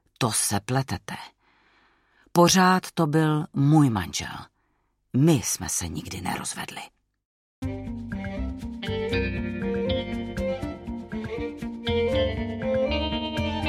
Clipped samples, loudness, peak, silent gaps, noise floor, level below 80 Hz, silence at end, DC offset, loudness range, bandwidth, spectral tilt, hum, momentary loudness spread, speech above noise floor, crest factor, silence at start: under 0.1%; -25 LUFS; -6 dBFS; 7.25-7.62 s; -71 dBFS; -42 dBFS; 0 s; under 0.1%; 9 LU; 16 kHz; -5 dB/octave; none; 14 LU; 48 dB; 20 dB; 0.2 s